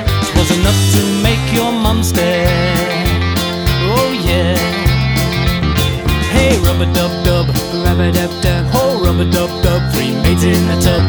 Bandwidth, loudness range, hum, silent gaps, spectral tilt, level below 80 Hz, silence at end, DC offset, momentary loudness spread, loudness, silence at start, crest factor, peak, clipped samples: over 20 kHz; 1 LU; none; none; -5 dB/octave; -22 dBFS; 0 s; under 0.1%; 3 LU; -13 LUFS; 0 s; 12 dB; 0 dBFS; under 0.1%